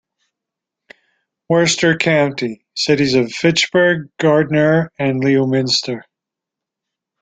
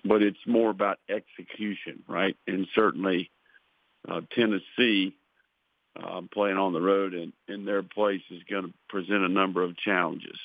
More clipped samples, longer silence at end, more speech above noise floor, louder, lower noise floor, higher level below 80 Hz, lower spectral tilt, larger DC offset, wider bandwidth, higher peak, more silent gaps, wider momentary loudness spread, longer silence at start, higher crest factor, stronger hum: neither; first, 1.2 s vs 0 s; first, 69 dB vs 47 dB; first, -15 LUFS vs -28 LUFS; first, -84 dBFS vs -75 dBFS; first, -56 dBFS vs -74 dBFS; second, -4.5 dB/octave vs -8 dB/octave; neither; first, 9.4 kHz vs 5 kHz; first, 0 dBFS vs -6 dBFS; neither; second, 6 LU vs 13 LU; first, 1.5 s vs 0.05 s; second, 16 dB vs 22 dB; neither